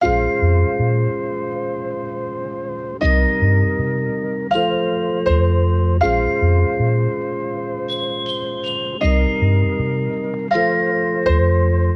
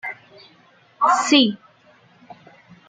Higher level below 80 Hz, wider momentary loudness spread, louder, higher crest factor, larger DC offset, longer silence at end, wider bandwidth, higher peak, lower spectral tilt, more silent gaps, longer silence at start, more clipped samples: first, -26 dBFS vs -74 dBFS; second, 9 LU vs 23 LU; about the same, -19 LUFS vs -17 LUFS; second, 14 dB vs 20 dB; neither; second, 0 s vs 1.35 s; second, 6 kHz vs 9.6 kHz; about the same, -4 dBFS vs -2 dBFS; first, -8.5 dB/octave vs -2.5 dB/octave; neither; about the same, 0 s vs 0.05 s; neither